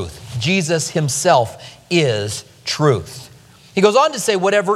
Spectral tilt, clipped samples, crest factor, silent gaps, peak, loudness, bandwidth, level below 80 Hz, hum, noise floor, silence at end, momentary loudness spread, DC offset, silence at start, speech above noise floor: -4 dB/octave; under 0.1%; 18 dB; none; 0 dBFS; -17 LUFS; 15 kHz; -50 dBFS; none; -41 dBFS; 0 s; 12 LU; under 0.1%; 0 s; 24 dB